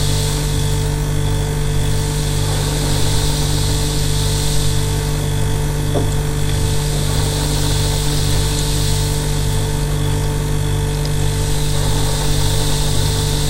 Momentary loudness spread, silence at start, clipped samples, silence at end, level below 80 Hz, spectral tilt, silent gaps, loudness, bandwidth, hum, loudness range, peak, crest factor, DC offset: 2 LU; 0 s; under 0.1%; 0 s; -22 dBFS; -4.5 dB/octave; none; -18 LUFS; 16 kHz; 50 Hz at -25 dBFS; 1 LU; -4 dBFS; 12 dB; under 0.1%